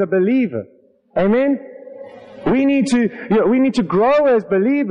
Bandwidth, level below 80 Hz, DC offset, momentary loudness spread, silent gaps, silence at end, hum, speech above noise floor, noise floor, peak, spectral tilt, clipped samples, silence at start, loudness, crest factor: 10.5 kHz; -50 dBFS; under 0.1%; 20 LU; none; 0 s; none; 21 dB; -36 dBFS; -8 dBFS; -7 dB/octave; under 0.1%; 0 s; -16 LUFS; 8 dB